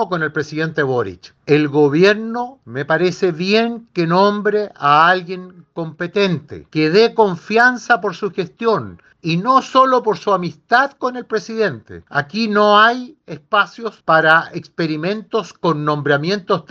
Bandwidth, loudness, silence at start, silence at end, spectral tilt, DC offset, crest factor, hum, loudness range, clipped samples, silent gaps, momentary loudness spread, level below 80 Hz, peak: 7.4 kHz; -16 LUFS; 0 s; 0.1 s; -6 dB/octave; under 0.1%; 16 dB; none; 2 LU; under 0.1%; none; 13 LU; -62 dBFS; 0 dBFS